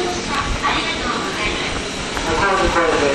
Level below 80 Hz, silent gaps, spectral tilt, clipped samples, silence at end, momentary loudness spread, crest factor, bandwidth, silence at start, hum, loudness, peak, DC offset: -32 dBFS; none; -3.5 dB/octave; under 0.1%; 0 s; 6 LU; 16 dB; 12 kHz; 0 s; none; -19 LUFS; -4 dBFS; under 0.1%